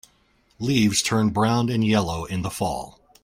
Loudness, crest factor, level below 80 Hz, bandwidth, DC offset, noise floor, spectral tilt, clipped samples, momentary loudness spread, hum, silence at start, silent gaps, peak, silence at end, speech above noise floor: -22 LUFS; 18 dB; -50 dBFS; 16 kHz; under 0.1%; -62 dBFS; -5 dB/octave; under 0.1%; 10 LU; none; 0.6 s; none; -6 dBFS; 0.35 s; 40 dB